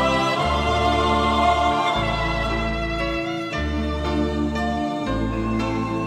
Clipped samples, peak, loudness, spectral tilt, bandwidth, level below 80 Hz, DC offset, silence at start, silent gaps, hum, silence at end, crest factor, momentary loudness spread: under 0.1%; -6 dBFS; -22 LUFS; -5.5 dB/octave; 13 kHz; -32 dBFS; under 0.1%; 0 s; none; none; 0 s; 16 dB; 6 LU